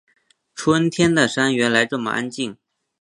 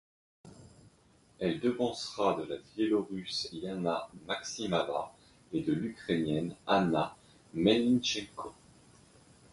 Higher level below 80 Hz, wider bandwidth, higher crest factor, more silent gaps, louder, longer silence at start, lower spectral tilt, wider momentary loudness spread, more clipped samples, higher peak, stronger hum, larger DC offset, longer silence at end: first, -56 dBFS vs -64 dBFS; about the same, 11.5 kHz vs 11.5 kHz; about the same, 20 dB vs 20 dB; neither; first, -19 LUFS vs -32 LUFS; about the same, 0.55 s vs 0.45 s; about the same, -4.5 dB/octave vs -5 dB/octave; about the same, 12 LU vs 11 LU; neither; first, 0 dBFS vs -12 dBFS; neither; neither; second, 0.5 s vs 1 s